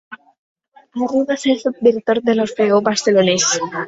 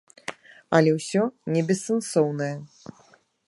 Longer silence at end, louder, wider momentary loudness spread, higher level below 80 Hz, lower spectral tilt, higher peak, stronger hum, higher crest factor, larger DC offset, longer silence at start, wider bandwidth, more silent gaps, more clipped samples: second, 0 s vs 0.8 s; first, -16 LUFS vs -24 LUFS; second, 5 LU vs 17 LU; first, -60 dBFS vs -70 dBFS; second, -3.5 dB/octave vs -6 dB/octave; about the same, -2 dBFS vs -4 dBFS; neither; second, 16 dB vs 22 dB; neither; second, 0.1 s vs 0.3 s; second, 8 kHz vs 11.5 kHz; first, 0.38-0.56 s vs none; neither